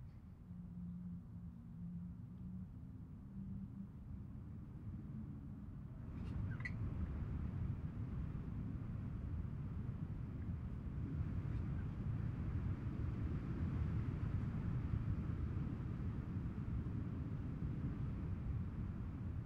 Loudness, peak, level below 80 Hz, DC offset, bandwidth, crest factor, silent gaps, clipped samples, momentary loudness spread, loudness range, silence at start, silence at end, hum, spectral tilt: -46 LUFS; -28 dBFS; -52 dBFS; under 0.1%; 5.8 kHz; 16 dB; none; under 0.1%; 10 LU; 9 LU; 0 s; 0 s; none; -10 dB/octave